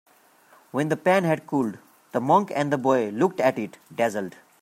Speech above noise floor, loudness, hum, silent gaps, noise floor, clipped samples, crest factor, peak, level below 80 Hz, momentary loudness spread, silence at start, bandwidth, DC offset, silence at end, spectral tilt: 33 dB; -24 LUFS; none; none; -56 dBFS; under 0.1%; 18 dB; -6 dBFS; -72 dBFS; 11 LU; 0.75 s; 16 kHz; under 0.1%; 0.3 s; -6.5 dB/octave